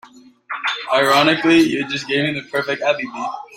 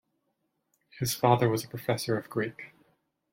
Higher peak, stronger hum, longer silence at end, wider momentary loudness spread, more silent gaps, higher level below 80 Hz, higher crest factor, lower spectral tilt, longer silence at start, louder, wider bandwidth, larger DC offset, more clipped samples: first, -2 dBFS vs -8 dBFS; neither; second, 0 s vs 0.65 s; about the same, 11 LU vs 13 LU; neither; about the same, -62 dBFS vs -66 dBFS; about the same, 18 dB vs 22 dB; about the same, -4.5 dB/octave vs -5 dB/octave; second, 0.05 s vs 0.95 s; first, -17 LUFS vs -29 LUFS; about the same, 16.5 kHz vs 16.5 kHz; neither; neither